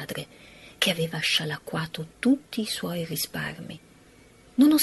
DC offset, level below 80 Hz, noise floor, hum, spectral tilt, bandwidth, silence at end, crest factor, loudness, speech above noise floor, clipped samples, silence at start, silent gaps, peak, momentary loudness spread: under 0.1%; -62 dBFS; -54 dBFS; none; -4 dB/octave; 12.5 kHz; 0 s; 20 dB; -27 LUFS; 26 dB; under 0.1%; 0 s; none; -6 dBFS; 19 LU